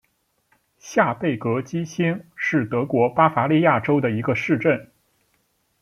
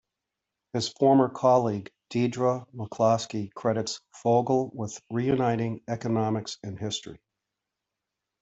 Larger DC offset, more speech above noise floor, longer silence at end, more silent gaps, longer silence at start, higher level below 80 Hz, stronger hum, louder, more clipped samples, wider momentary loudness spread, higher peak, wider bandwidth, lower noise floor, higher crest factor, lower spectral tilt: neither; second, 49 dB vs 60 dB; second, 0.95 s vs 1.25 s; neither; about the same, 0.85 s vs 0.75 s; about the same, -62 dBFS vs -66 dBFS; neither; first, -21 LUFS vs -27 LUFS; neither; second, 8 LU vs 13 LU; first, -2 dBFS vs -8 dBFS; first, 12 kHz vs 8.2 kHz; second, -69 dBFS vs -86 dBFS; about the same, 20 dB vs 20 dB; about the same, -7 dB/octave vs -6 dB/octave